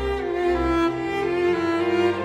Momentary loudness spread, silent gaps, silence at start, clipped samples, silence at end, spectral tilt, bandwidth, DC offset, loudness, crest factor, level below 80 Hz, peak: 3 LU; none; 0 s; under 0.1%; 0 s; -6.5 dB/octave; 9.2 kHz; under 0.1%; -22 LUFS; 12 dB; -38 dBFS; -10 dBFS